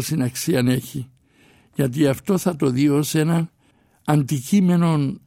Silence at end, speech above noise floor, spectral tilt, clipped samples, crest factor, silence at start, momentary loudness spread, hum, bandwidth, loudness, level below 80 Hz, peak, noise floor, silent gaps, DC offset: 0.1 s; 40 dB; -6.5 dB/octave; under 0.1%; 16 dB; 0 s; 14 LU; none; 16.5 kHz; -20 LUFS; -56 dBFS; -4 dBFS; -59 dBFS; none; under 0.1%